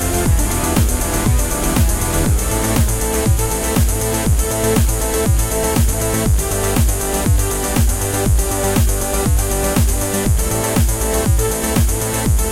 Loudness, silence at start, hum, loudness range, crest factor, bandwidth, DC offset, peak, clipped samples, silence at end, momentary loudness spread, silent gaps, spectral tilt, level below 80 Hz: -16 LUFS; 0 s; none; 0 LU; 14 dB; 17 kHz; under 0.1%; -2 dBFS; under 0.1%; 0 s; 1 LU; none; -4.5 dB/octave; -20 dBFS